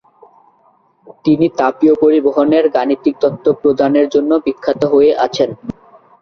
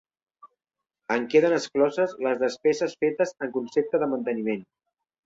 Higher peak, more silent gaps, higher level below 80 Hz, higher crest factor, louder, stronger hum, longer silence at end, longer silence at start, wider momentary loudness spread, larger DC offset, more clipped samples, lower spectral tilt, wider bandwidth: first, -2 dBFS vs -8 dBFS; neither; first, -52 dBFS vs -72 dBFS; second, 12 dB vs 18 dB; first, -13 LUFS vs -25 LUFS; neither; about the same, 0.5 s vs 0.6 s; first, 1.25 s vs 0.45 s; about the same, 7 LU vs 8 LU; neither; neither; first, -7 dB/octave vs -5 dB/octave; second, 6.6 kHz vs 7.8 kHz